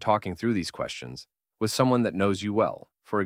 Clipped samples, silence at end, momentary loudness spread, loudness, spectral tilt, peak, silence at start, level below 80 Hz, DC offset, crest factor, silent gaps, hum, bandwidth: under 0.1%; 0 s; 15 LU; -27 LUFS; -5.5 dB/octave; -8 dBFS; 0 s; -60 dBFS; under 0.1%; 20 dB; none; none; 16 kHz